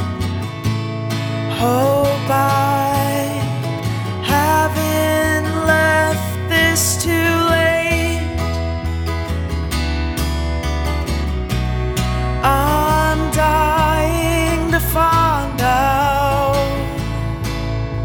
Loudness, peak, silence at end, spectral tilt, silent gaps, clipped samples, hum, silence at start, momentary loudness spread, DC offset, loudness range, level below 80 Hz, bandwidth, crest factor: -17 LUFS; -2 dBFS; 0 s; -5 dB/octave; none; under 0.1%; none; 0 s; 8 LU; under 0.1%; 5 LU; -26 dBFS; over 20 kHz; 16 dB